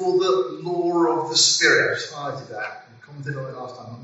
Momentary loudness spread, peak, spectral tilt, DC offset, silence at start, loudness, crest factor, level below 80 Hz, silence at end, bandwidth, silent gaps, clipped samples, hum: 18 LU; -4 dBFS; -1.5 dB/octave; under 0.1%; 0 s; -20 LUFS; 18 dB; -72 dBFS; 0 s; 8 kHz; none; under 0.1%; none